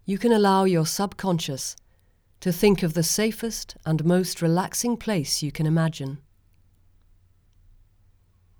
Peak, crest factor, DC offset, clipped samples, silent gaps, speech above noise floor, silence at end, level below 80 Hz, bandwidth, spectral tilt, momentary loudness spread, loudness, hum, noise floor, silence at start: -6 dBFS; 18 dB; under 0.1%; under 0.1%; none; 38 dB; 2.4 s; -52 dBFS; over 20 kHz; -5 dB/octave; 12 LU; -24 LUFS; none; -61 dBFS; 0.05 s